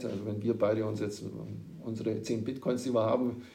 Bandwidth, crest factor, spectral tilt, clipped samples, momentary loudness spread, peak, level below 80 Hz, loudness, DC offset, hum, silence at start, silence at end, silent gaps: 16 kHz; 16 dB; -7 dB/octave; under 0.1%; 12 LU; -16 dBFS; -68 dBFS; -33 LUFS; under 0.1%; none; 0 s; 0 s; none